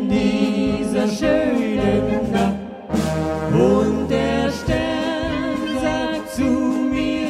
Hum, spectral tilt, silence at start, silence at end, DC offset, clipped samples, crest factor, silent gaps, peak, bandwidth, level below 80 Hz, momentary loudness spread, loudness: none; -6.5 dB/octave; 0 s; 0 s; under 0.1%; under 0.1%; 16 dB; none; -2 dBFS; 14.5 kHz; -38 dBFS; 5 LU; -20 LUFS